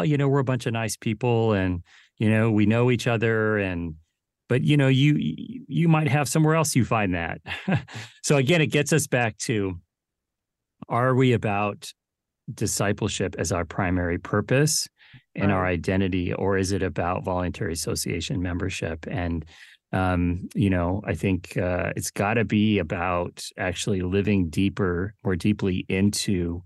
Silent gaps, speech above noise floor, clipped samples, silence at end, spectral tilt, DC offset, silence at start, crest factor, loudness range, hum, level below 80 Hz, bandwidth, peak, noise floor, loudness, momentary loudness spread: none; 61 dB; under 0.1%; 0.05 s; -5.5 dB/octave; under 0.1%; 0 s; 16 dB; 4 LU; none; -48 dBFS; 12.5 kHz; -8 dBFS; -85 dBFS; -24 LUFS; 9 LU